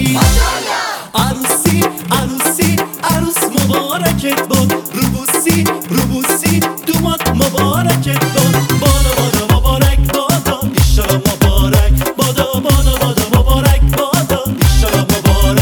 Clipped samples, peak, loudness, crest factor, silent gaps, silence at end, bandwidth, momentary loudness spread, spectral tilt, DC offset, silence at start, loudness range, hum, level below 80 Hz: under 0.1%; 0 dBFS; -13 LUFS; 12 dB; none; 0 s; over 20 kHz; 4 LU; -4.5 dB/octave; under 0.1%; 0 s; 1 LU; none; -18 dBFS